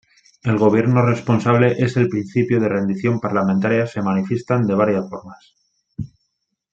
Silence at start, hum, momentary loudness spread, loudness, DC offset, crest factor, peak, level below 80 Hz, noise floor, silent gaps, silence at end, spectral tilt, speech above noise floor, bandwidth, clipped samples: 0.45 s; none; 17 LU; -18 LUFS; under 0.1%; 16 dB; -2 dBFS; -56 dBFS; -73 dBFS; none; 0.7 s; -8.5 dB/octave; 56 dB; 7.8 kHz; under 0.1%